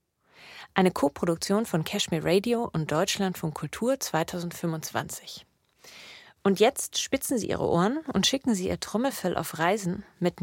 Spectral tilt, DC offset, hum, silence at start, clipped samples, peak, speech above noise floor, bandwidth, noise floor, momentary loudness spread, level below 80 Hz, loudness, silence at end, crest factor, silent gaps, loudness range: -4.5 dB/octave; under 0.1%; none; 0.4 s; under 0.1%; -6 dBFS; 28 dB; 17 kHz; -55 dBFS; 11 LU; -58 dBFS; -27 LUFS; 0 s; 22 dB; none; 4 LU